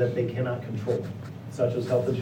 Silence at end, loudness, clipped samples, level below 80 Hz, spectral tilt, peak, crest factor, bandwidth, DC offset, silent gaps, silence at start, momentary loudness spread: 0 s; -29 LUFS; under 0.1%; -64 dBFS; -8 dB/octave; -12 dBFS; 16 dB; 15.5 kHz; under 0.1%; none; 0 s; 12 LU